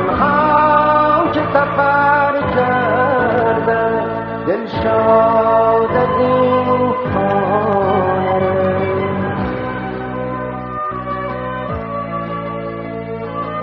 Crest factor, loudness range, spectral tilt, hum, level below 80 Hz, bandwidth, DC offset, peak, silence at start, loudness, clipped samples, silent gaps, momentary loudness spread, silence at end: 16 dB; 9 LU; -5 dB/octave; none; -40 dBFS; 5.8 kHz; under 0.1%; 0 dBFS; 0 s; -16 LUFS; under 0.1%; none; 11 LU; 0 s